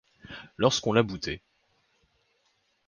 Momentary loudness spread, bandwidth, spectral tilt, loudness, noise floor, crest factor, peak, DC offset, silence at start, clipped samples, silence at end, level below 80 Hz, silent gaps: 20 LU; 10 kHz; -4.5 dB/octave; -27 LUFS; -72 dBFS; 24 dB; -6 dBFS; under 0.1%; 0.3 s; under 0.1%; 1.5 s; -56 dBFS; none